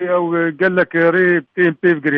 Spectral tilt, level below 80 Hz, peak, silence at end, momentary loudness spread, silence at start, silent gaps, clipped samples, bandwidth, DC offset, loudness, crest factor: -9.5 dB/octave; -64 dBFS; -2 dBFS; 0 s; 4 LU; 0 s; none; under 0.1%; 4.7 kHz; under 0.1%; -15 LUFS; 12 dB